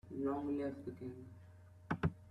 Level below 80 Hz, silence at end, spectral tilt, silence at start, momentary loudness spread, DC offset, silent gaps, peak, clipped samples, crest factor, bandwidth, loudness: -62 dBFS; 0 s; -9 dB/octave; 0.05 s; 20 LU; under 0.1%; none; -22 dBFS; under 0.1%; 20 dB; 9.8 kHz; -42 LUFS